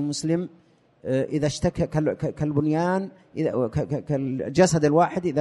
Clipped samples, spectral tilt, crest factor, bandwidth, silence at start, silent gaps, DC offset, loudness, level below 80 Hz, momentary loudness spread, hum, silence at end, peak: under 0.1%; -6.5 dB/octave; 18 dB; 11.5 kHz; 0 s; none; under 0.1%; -24 LUFS; -50 dBFS; 8 LU; none; 0 s; -6 dBFS